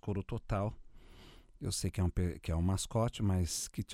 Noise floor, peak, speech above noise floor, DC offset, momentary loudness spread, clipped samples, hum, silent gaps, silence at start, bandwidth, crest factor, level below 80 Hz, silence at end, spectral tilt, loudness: -56 dBFS; -20 dBFS; 22 dB; under 0.1%; 6 LU; under 0.1%; none; none; 0.05 s; 15.5 kHz; 16 dB; -46 dBFS; 0 s; -5.5 dB/octave; -36 LUFS